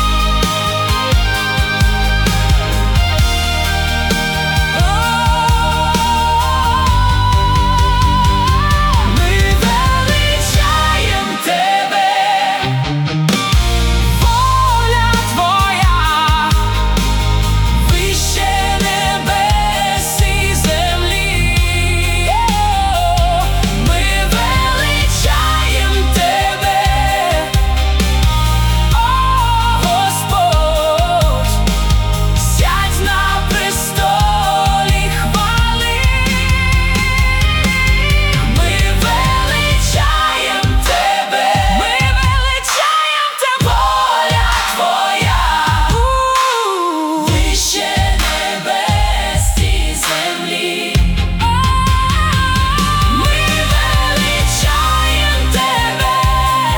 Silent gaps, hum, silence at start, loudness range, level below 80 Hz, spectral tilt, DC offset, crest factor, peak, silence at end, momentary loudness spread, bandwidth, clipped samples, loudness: none; none; 0 s; 1 LU; -16 dBFS; -4 dB/octave; under 0.1%; 12 dB; 0 dBFS; 0 s; 2 LU; 18 kHz; under 0.1%; -13 LUFS